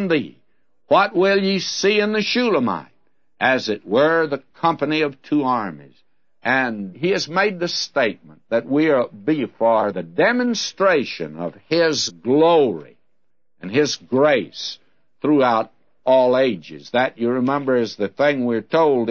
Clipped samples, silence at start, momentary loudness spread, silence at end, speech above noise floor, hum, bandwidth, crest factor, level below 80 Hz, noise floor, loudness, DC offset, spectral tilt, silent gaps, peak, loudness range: under 0.1%; 0 s; 10 LU; 0 s; 57 dB; none; 7.4 kHz; 16 dB; -68 dBFS; -76 dBFS; -19 LUFS; 0.2%; -4.5 dB/octave; none; -2 dBFS; 2 LU